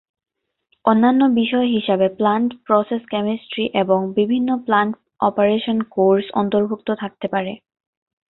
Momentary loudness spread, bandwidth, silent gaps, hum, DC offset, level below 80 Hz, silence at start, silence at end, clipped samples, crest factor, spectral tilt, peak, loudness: 8 LU; 4.1 kHz; none; none; under 0.1%; -62 dBFS; 0.85 s; 0.75 s; under 0.1%; 18 dB; -11 dB/octave; -2 dBFS; -19 LUFS